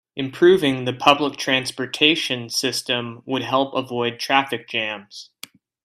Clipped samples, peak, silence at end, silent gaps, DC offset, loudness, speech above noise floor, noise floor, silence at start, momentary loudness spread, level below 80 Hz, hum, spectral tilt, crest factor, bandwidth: under 0.1%; 0 dBFS; 0.6 s; none; under 0.1%; -20 LUFS; 24 dB; -44 dBFS; 0.15 s; 11 LU; -64 dBFS; none; -3.5 dB/octave; 22 dB; 14.5 kHz